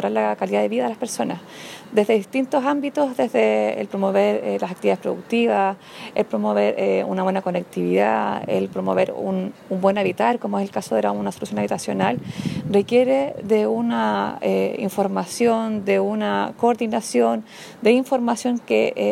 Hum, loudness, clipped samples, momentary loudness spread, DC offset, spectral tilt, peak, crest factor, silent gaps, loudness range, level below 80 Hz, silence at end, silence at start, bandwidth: none; -21 LUFS; under 0.1%; 7 LU; under 0.1%; -5.5 dB/octave; -4 dBFS; 18 dB; none; 2 LU; -64 dBFS; 0 s; 0 s; 16 kHz